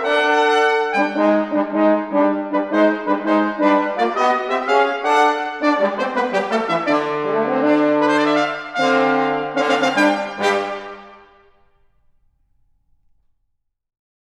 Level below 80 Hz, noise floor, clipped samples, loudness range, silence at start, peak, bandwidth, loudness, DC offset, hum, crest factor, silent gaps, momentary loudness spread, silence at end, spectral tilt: -64 dBFS; -70 dBFS; under 0.1%; 4 LU; 0 s; -2 dBFS; 11 kHz; -17 LUFS; under 0.1%; none; 16 dB; none; 5 LU; 3.15 s; -4.5 dB/octave